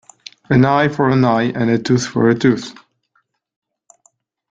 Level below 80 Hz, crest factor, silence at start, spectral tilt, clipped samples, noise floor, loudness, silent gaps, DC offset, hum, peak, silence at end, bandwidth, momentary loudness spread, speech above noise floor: -52 dBFS; 16 dB; 0.5 s; -6.5 dB/octave; under 0.1%; -65 dBFS; -15 LUFS; none; under 0.1%; none; -2 dBFS; 1.8 s; 7.8 kHz; 4 LU; 50 dB